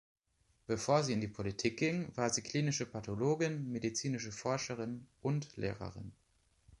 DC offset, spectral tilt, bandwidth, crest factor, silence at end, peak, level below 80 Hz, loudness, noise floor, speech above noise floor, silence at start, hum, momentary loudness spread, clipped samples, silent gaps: under 0.1%; -5 dB/octave; 11.5 kHz; 20 dB; 0.05 s; -18 dBFS; -64 dBFS; -37 LUFS; -75 dBFS; 39 dB; 0.7 s; none; 10 LU; under 0.1%; none